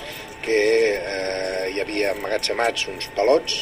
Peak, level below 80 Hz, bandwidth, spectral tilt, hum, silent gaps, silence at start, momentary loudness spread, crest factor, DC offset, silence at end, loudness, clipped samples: -6 dBFS; -50 dBFS; 16 kHz; -2.5 dB/octave; none; none; 0 s; 7 LU; 16 dB; under 0.1%; 0 s; -22 LUFS; under 0.1%